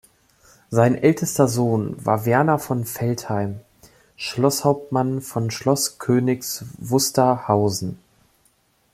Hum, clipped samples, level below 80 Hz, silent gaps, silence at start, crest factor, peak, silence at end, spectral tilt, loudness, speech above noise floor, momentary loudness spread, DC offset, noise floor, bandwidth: none; under 0.1%; -58 dBFS; none; 0.7 s; 18 dB; -2 dBFS; 1 s; -5.5 dB/octave; -21 LUFS; 42 dB; 10 LU; under 0.1%; -62 dBFS; 16 kHz